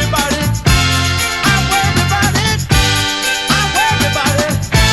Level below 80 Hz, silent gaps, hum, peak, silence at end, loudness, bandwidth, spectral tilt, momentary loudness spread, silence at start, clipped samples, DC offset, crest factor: -24 dBFS; none; none; 0 dBFS; 0 s; -13 LUFS; 16.5 kHz; -3.5 dB/octave; 3 LU; 0 s; under 0.1%; 0.2%; 14 dB